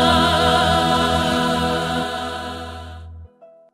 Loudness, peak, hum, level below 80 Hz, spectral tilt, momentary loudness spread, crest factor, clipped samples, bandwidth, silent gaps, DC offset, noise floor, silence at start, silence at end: -18 LUFS; -4 dBFS; none; -40 dBFS; -4.5 dB/octave; 18 LU; 16 dB; under 0.1%; 16.5 kHz; none; under 0.1%; -46 dBFS; 0 s; 0.25 s